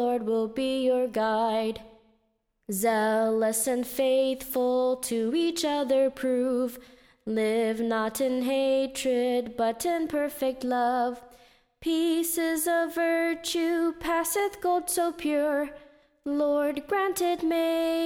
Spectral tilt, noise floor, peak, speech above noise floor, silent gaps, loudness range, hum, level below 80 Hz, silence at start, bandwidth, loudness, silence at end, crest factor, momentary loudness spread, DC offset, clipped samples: -3 dB/octave; -74 dBFS; -14 dBFS; 47 dB; none; 2 LU; none; -60 dBFS; 0 s; 20 kHz; -27 LUFS; 0 s; 12 dB; 5 LU; under 0.1%; under 0.1%